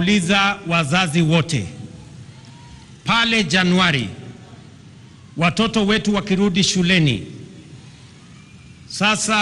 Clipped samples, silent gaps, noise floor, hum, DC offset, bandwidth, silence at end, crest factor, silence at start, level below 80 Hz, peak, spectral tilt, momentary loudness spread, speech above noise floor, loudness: under 0.1%; none; -43 dBFS; none; under 0.1%; 12 kHz; 0 s; 18 dB; 0 s; -46 dBFS; -2 dBFS; -4.5 dB/octave; 20 LU; 26 dB; -17 LUFS